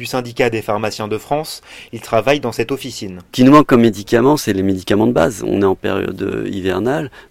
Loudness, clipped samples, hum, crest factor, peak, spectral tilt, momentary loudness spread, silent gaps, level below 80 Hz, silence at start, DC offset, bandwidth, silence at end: -16 LUFS; 0.3%; none; 16 dB; 0 dBFS; -6 dB/octave; 13 LU; none; -44 dBFS; 0 s; under 0.1%; 16.5 kHz; 0.1 s